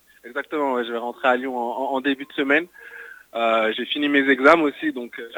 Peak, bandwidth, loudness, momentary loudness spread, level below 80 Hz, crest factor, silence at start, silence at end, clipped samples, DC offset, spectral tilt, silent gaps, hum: 0 dBFS; 19.5 kHz; -21 LUFS; 17 LU; -68 dBFS; 22 dB; 0.25 s; 0 s; under 0.1%; under 0.1%; -4.5 dB/octave; none; none